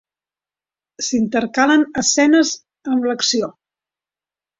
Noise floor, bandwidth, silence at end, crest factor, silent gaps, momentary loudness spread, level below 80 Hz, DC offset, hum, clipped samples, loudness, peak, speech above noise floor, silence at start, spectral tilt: under -90 dBFS; 7.8 kHz; 1.1 s; 16 dB; none; 10 LU; -58 dBFS; under 0.1%; none; under 0.1%; -17 LUFS; -2 dBFS; over 74 dB; 1 s; -2.5 dB/octave